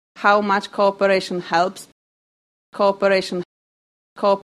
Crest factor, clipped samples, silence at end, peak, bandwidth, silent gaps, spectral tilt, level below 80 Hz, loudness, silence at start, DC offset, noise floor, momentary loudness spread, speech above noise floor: 18 dB; under 0.1%; 0.1 s; -2 dBFS; 13 kHz; 1.92-2.72 s, 3.45-4.16 s; -5 dB/octave; -66 dBFS; -19 LUFS; 0.15 s; under 0.1%; under -90 dBFS; 13 LU; over 71 dB